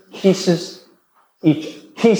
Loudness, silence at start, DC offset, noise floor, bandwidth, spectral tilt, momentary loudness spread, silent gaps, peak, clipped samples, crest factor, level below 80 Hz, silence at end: -19 LUFS; 0.15 s; under 0.1%; -58 dBFS; over 20 kHz; -6 dB/octave; 14 LU; none; -2 dBFS; under 0.1%; 18 dB; -70 dBFS; 0 s